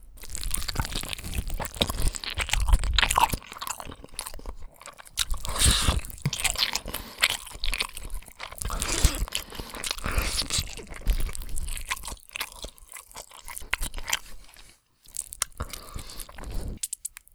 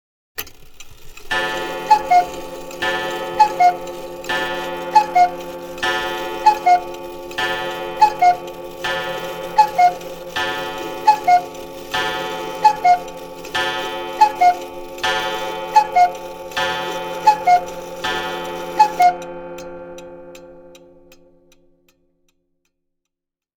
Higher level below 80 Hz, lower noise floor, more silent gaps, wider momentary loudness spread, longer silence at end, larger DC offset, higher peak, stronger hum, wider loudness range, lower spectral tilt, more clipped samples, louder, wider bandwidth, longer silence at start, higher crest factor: first, -32 dBFS vs -48 dBFS; second, -54 dBFS vs -83 dBFS; neither; about the same, 17 LU vs 18 LU; second, 0.25 s vs 2.8 s; neither; about the same, -2 dBFS vs 0 dBFS; neither; first, 8 LU vs 3 LU; about the same, -2 dB/octave vs -3 dB/octave; neither; second, -29 LUFS vs -18 LUFS; about the same, over 20 kHz vs 19 kHz; second, 0 s vs 0.35 s; first, 28 dB vs 18 dB